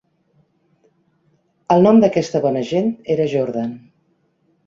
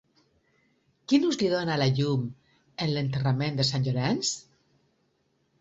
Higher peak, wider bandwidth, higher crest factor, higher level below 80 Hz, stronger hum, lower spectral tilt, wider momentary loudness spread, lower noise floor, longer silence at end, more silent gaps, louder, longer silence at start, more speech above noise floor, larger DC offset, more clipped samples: first, -2 dBFS vs -10 dBFS; about the same, 7.6 kHz vs 8 kHz; about the same, 18 dB vs 18 dB; about the same, -60 dBFS vs -60 dBFS; neither; first, -7.5 dB/octave vs -5.5 dB/octave; about the same, 13 LU vs 11 LU; second, -63 dBFS vs -72 dBFS; second, 0.9 s vs 1.2 s; neither; first, -17 LUFS vs -27 LUFS; first, 1.7 s vs 1.1 s; about the same, 47 dB vs 46 dB; neither; neither